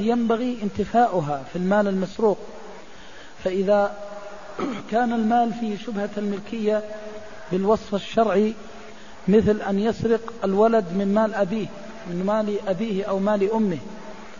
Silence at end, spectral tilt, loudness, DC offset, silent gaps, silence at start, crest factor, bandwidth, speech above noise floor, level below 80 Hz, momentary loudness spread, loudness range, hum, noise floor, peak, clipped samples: 0 s; -7 dB/octave; -23 LUFS; 1%; none; 0 s; 18 dB; 7.4 kHz; 22 dB; -52 dBFS; 18 LU; 3 LU; none; -44 dBFS; -6 dBFS; under 0.1%